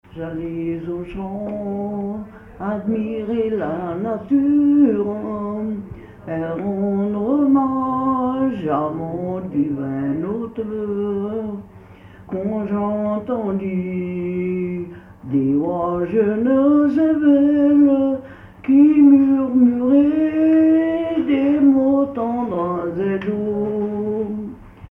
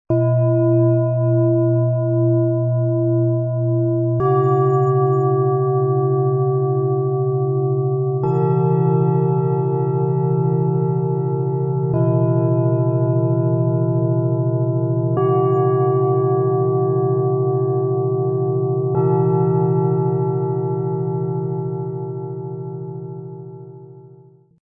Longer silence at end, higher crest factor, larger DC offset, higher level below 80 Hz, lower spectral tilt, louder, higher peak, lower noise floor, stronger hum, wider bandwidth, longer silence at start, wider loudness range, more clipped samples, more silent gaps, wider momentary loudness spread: second, 0.05 s vs 0.55 s; about the same, 14 dB vs 12 dB; neither; first, -50 dBFS vs -58 dBFS; second, -10.5 dB/octave vs -13.5 dB/octave; about the same, -19 LUFS vs -18 LUFS; about the same, -4 dBFS vs -6 dBFS; second, -42 dBFS vs -47 dBFS; neither; first, 3.4 kHz vs 2.8 kHz; about the same, 0.15 s vs 0.1 s; first, 10 LU vs 4 LU; neither; neither; first, 13 LU vs 6 LU